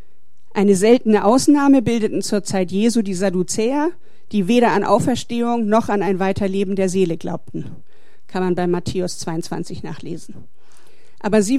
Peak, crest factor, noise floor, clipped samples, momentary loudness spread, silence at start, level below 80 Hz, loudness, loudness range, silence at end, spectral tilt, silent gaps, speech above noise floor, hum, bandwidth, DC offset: -2 dBFS; 16 dB; -63 dBFS; under 0.1%; 15 LU; 0.55 s; -52 dBFS; -18 LUFS; 9 LU; 0 s; -5.5 dB/octave; none; 45 dB; none; 14 kHz; 4%